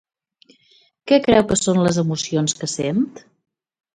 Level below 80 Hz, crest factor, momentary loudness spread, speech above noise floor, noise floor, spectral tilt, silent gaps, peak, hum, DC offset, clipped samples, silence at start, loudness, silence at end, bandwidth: -50 dBFS; 18 dB; 8 LU; 39 dB; -57 dBFS; -5 dB/octave; none; -2 dBFS; none; under 0.1%; under 0.1%; 1.05 s; -19 LUFS; 0.75 s; 11 kHz